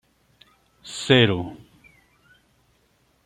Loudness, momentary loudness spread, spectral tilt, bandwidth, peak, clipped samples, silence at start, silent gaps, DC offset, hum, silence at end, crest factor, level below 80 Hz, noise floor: -20 LUFS; 20 LU; -5 dB/octave; 11.5 kHz; -4 dBFS; under 0.1%; 0.85 s; none; under 0.1%; none; 1.7 s; 24 dB; -60 dBFS; -64 dBFS